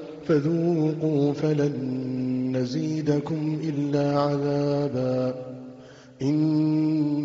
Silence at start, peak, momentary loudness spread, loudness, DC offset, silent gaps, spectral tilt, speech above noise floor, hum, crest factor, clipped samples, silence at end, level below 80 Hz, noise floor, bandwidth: 0 s; -10 dBFS; 6 LU; -25 LUFS; under 0.1%; none; -8 dB/octave; 22 dB; none; 16 dB; under 0.1%; 0 s; -64 dBFS; -46 dBFS; 7.6 kHz